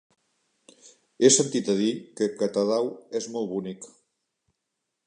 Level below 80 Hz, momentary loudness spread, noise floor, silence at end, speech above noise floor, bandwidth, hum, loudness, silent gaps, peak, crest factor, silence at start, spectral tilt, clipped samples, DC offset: -76 dBFS; 14 LU; -82 dBFS; 1.2 s; 57 dB; 11 kHz; none; -25 LUFS; none; -4 dBFS; 22 dB; 0.85 s; -3.5 dB/octave; under 0.1%; under 0.1%